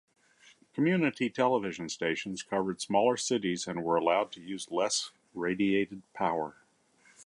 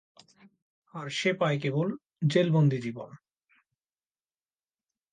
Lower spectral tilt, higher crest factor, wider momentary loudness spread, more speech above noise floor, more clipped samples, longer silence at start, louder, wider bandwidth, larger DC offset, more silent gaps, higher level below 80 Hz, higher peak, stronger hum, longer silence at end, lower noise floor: second, -4 dB/octave vs -6.5 dB/octave; about the same, 18 dB vs 20 dB; second, 9 LU vs 18 LU; second, 35 dB vs over 63 dB; neither; second, 0.75 s vs 0.95 s; second, -31 LUFS vs -28 LUFS; first, 11.5 kHz vs 9.4 kHz; neither; neither; about the same, -70 dBFS vs -74 dBFS; about the same, -12 dBFS vs -12 dBFS; neither; second, 0.05 s vs 1.95 s; second, -65 dBFS vs under -90 dBFS